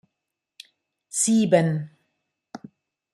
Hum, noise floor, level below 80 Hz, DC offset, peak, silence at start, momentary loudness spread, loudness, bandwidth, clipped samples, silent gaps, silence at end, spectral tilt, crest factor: none; -84 dBFS; -70 dBFS; under 0.1%; -4 dBFS; 1.15 s; 25 LU; -22 LUFS; 13.5 kHz; under 0.1%; none; 0.55 s; -5 dB/octave; 22 dB